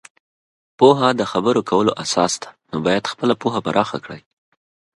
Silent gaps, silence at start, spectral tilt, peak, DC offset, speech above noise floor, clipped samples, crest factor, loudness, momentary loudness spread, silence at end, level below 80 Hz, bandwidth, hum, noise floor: none; 0.8 s; -4.5 dB/octave; 0 dBFS; under 0.1%; over 72 dB; under 0.1%; 20 dB; -18 LUFS; 13 LU; 0.75 s; -58 dBFS; 11.5 kHz; none; under -90 dBFS